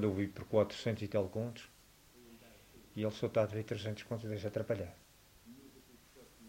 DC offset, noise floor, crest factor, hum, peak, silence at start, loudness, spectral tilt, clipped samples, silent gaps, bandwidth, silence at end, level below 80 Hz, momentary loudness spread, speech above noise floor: under 0.1%; -62 dBFS; 22 dB; 50 Hz at -65 dBFS; -18 dBFS; 0 s; -38 LUFS; -7 dB/octave; under 0.1%; none; 16 kHz; 0 s; -68 dBFS; 24 LU; 26 dB